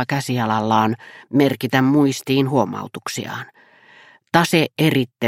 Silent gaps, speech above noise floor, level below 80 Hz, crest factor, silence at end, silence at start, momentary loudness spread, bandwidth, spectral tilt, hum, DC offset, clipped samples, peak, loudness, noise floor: none; 30 dB; -62 dBFS; 18 dB; 0 s; 0 s; 12 LU; 16.5 kHz; -5.5 dB/octave; none; under 0.1%; under 0.1%; 0 dBFS; -19 LUFS; -49 dBFS